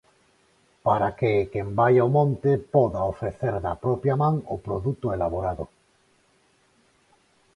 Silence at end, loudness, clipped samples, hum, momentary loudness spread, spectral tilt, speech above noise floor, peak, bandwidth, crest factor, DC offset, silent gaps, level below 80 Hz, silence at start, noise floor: 1.9 s; -24 LUFS; under 0.1%; none; 9 LU; -9.5 dB/octave; 40 dB; -6 dBFS; 10.5 kHz; 18 dB; under 0.1%; none; -48 dBFS; 0.85 s; -64 dBFS